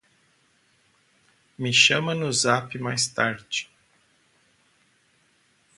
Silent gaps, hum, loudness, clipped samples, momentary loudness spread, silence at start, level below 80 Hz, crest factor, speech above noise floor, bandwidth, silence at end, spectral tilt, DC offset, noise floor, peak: none; none; -22 LUFS; under 0.1%; 14 LU; 1.6 s; -68 dBFS; 24 dB; 41 dB; 11.5 kHz; 2.15 s; -2.5 dB/octave; under 0.1%; -64 dBFS; -4 dBFS